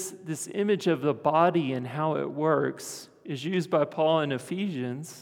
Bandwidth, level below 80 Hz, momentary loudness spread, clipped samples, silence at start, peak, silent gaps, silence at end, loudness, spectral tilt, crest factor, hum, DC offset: 18.5 kHz; -80 dBFS; 11 LU; under 0.1%; 0 s; -8 dBFS; none; 0 s; -27 LUFS; -5.5 dB/octave; 18 dB; none; under 0.1%